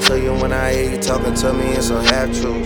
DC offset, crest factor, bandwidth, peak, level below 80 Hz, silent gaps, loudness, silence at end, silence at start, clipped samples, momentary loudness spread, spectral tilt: under 0.1%; 16 dB; over 20 kHz; 0 dBFS; -26 dBFS; none; -17 LUFS; 0 s; 0 s; under 0.1%; 4 LU; -4 dB/octave